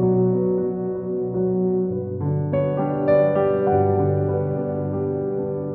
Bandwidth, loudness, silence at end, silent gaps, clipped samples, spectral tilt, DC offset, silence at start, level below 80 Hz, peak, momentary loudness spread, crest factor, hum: 4 kHz; -22 LUFS; 0 s; none; under 0.1%; -10.5 dB/octave; under 0.1%; 0 s; -54 dBFS; -6 dBFS; 7 LU; 14 dB; none